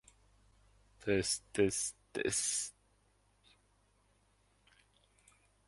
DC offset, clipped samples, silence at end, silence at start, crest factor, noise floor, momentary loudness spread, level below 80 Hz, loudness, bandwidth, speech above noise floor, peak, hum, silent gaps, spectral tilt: under 0.1%; under 0.1%; 2.95 s; 1 s; 22 dB; -72 dBFS; 7 LU; -66 dBFS; -35 LUFS; 11.5 kHz; 37 dB; -18 dBFS; 50 Hz at -65 dBFS; none; -3 dB/octave